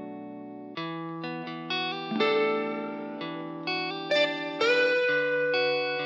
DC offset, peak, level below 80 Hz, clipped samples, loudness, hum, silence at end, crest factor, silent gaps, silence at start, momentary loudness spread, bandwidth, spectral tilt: under 0.1%; -12 dBFS; -82 dBFS; under 0.1%; -28 LUFS; none; 0 s; 16 dB; none; 0 s; 13 LU; 7.8 kHz; -4.5 dB/octave